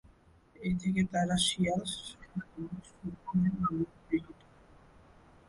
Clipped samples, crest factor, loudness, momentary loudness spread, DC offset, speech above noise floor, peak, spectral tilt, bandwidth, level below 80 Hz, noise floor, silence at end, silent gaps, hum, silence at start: under 0.1%; 18 dB; -33 LUFS; 15 LU; under 0.1%; 29 dB; -16 dBFS; -5 dB/octave; 11.5 kHz; -56 dBFS; -61 dBFS; 1.15 s; none; none; 0.6 s